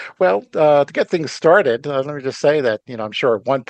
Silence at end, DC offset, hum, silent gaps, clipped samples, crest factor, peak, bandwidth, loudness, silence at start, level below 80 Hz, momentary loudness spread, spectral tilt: 0.05 s; under 0.1%; none; none; under 0.1%; 16 dB; 0 dBFS; 8.8 kHz; -17 LUFS; 0 s; -68 dBFS; 9 LU; -5.5 dB/octave